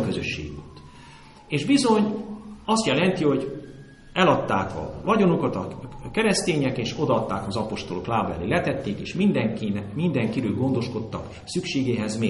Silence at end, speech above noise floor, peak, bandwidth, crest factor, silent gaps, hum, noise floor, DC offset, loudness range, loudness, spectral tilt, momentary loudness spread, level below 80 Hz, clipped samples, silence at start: 0 s; 23 dB; -6 dBFS; 11.5 kHz; 18 dB; none; none; -47 dBFS; under 0.1%; 2 LU; -24 LUFS; -5.5 dB/octave; 13 LU; -48 dBFS; under 0.1%; 0 s